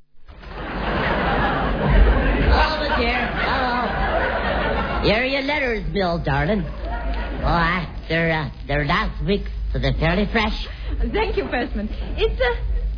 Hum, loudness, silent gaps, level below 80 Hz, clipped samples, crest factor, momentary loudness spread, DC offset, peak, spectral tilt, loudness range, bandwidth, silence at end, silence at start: none; -21 LUFS; none; -26 dBFS; under 0.1%; 18 dB; 9 LU; under 0.1%; -2 dBFS; -7.5 dB/octave; 3 LU; 5.4 kHz; 0 s; 0.15 s